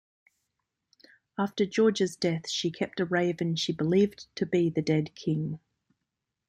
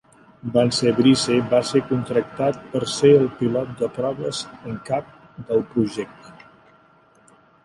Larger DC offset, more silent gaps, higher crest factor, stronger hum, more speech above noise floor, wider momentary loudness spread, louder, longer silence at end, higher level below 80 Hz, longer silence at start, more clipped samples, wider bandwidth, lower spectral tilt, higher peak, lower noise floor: neither; neither; about the same, 18 dB vs 18 dB; neither; first, 57 dB vs 35 dB; second, 8 LU vs 14 LU; second, -28 LUFS vs -21 LUFS; second, 0.9 s vs 1.35 s; second, -68 dBFS vs -56 dBFS; first, 1.4 s vs 0.45 s; neither; about the same, 12 kHz vs 11.5 kHz; about the same, -5.5 dB/octave vs -5.5 dB/octave; second, -12 dBFS vs -4 dBFS; first, -85 dBFS vs -55 dBFS